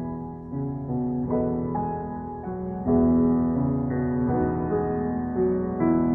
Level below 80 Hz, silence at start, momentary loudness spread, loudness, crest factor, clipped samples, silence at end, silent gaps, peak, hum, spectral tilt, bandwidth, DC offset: -44 dBFS; 0 s; 12 LU; -26 LUFS; 14 dB; under 0.1%; 0 s; none; -10 dBFS; none; -14.5 dB/octave; 2.5 kHz; under 0.1%